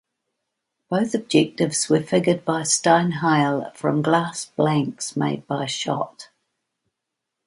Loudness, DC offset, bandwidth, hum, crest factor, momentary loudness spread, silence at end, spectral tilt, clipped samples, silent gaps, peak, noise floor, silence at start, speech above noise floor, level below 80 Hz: -21 LUFS; under 0.1%; 11.5 kHz; none; 20 dB; 8 LU; 1.2 s; -4.5 dB/octave; under 0.1%; none; -4 dBFS; -82 dBFS; 0.9 s; 61 dB; -66 dBFS